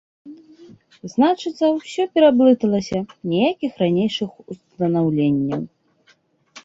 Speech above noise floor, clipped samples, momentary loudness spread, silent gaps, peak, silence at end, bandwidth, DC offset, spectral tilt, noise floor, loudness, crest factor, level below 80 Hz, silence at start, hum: 40 dB; under 0.1%; 14 LU; none; -2 dBFS; 0.05 s; 7.8 kHz; under 0.1%; -7 dB/octave; -59 dBFS; -19 LUFS; 18 dB; -60 dBFS; 0.25 s; none